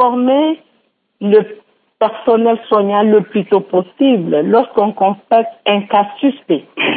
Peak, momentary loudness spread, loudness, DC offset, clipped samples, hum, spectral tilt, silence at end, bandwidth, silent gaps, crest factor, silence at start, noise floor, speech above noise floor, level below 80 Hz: 0 dBFS; 6 LU; -14 LUFS; under 0.1%; under 0.1%; none; -11.5 dB/octave; 0 s; 4.5 kHz; none; 14 dB; 0 s; -60 dBFS; 47 dB; -64 dBFS